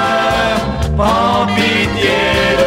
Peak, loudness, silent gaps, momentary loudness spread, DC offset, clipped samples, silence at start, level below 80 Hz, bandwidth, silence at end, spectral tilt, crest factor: 0 dBFS; -13 LUFS; none; 3 LU; under 0.1%; under 0.1%; 0 s; -26 dBFS; 16.5 kHz; 0 s; -5 dB/octave; 12 dB